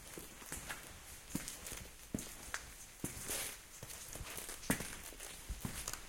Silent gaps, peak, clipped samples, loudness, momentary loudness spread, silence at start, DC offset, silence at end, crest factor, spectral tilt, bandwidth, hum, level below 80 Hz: none; -20 dBFS; under 0.1%; -45 LUFS; 10 LU; 0 s; under 0.1%; 0 s; 28 dB; -2.5 dB/octave; 17 kHz; none; -56 dBFS